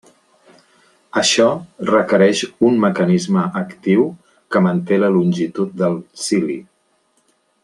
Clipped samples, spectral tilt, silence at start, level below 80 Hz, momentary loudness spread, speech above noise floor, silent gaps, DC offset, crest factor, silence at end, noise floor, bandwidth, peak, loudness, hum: under 0.1%; -5 dB/octave; 1.15 s; -62 dBFS; 9 LU; 46 dB; none; under 0.1%; 16 dB; 1 s; -62 dBFS; 11.5 kHz; -2 dBFS; -17 LUFS; none